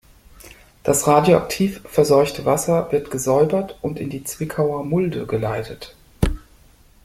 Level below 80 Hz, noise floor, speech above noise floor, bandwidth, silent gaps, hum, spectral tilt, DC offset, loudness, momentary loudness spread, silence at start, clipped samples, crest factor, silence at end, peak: -36 dBFS; -51 dBFS; 32 dB; 16 kHz; none; none; -5.5 dB/octave; under 0.1%; -20 LUFS; 12 LU; 0.4 s; under 0.1%; 18 dB; 0.65 s; -2 dBFS